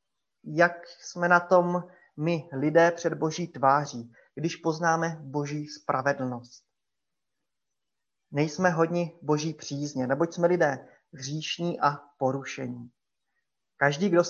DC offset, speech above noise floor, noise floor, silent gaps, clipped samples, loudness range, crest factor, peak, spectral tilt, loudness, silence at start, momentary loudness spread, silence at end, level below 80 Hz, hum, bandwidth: under 0.1%; 61 dB; -88 dBFS; none; under 0.1%; 6 LU; 22 dB; -6 dBFS; -5.5 dB/octave; -27 LUFS; 0.45 s; 13 LU; 0 s; -74 dBFS; none; 7.4 kHz